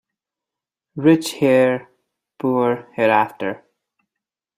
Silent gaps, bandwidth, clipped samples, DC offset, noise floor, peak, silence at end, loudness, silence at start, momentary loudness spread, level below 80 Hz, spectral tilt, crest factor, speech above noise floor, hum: none; 15.5 kHz; under 0.1%; under 0.1%; -87 dBFS; -2 dBFS; 1 s; -18 LUFS; 0.95 s; 12 LU; -66 dBFS; -6 dB/octave; 18 dB; 69 dB; none